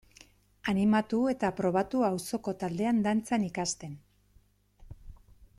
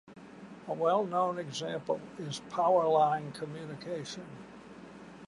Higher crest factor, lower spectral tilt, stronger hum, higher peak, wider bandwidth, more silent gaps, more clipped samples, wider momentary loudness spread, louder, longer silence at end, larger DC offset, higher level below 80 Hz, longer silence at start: about the same, 16 dB vs 18 dB; about the same, -5.5 dB/octave vs -5 dB/octave; first, 50 Hz at -55 dBFS vs none; about the same, -16 dBFS vs -14 dBFS; first, 13.5 kHz vs 11.5 kHz; neither; neither; second, 10 LU vs 23 LU; about the same, -30 LUFS vs -32 LUFS; first, 0.45 s vs 0 s; neither; first, -58 dBFS vs -72 dBFS; first, 0.65 s vs 0.05 s